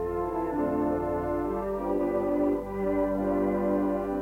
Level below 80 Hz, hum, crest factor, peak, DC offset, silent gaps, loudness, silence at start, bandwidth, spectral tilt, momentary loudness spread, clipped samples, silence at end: -46 dBFS; 50 Hz at -45 dBFS; 10 dB; -16 dBFS; under 0.1%; none; -28 LUFS; 0 s; 16.5 kHz; -9 dB/octave; 3 LU; under 0.1%; 0 s